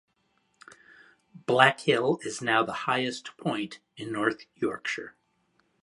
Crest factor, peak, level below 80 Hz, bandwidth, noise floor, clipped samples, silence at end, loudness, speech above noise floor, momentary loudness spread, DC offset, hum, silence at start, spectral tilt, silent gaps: 28 dB; -2 dBFS; -74 dBFS; 11.5 kHz; -72 dBFS; under 0.1%; 0.75 s; -27 LUFS; 44 dB; 15 LU; under 0.1%; none; 0.7 s; -4.5 dB/octave; none